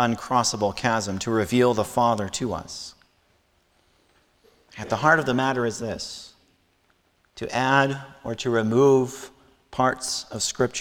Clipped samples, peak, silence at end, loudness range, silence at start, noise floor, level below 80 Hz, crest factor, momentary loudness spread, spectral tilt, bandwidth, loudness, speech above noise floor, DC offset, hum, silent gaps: under 0.1%; -4 dBFS; 0 s; 4 LU; 0 s; -65 dBFS; -56 dBFS; 20 dB; 16 LU; -4.5 dB/octave; 17.5 kHz; -23 LUFS; 42 dB; under 0.1%; none; none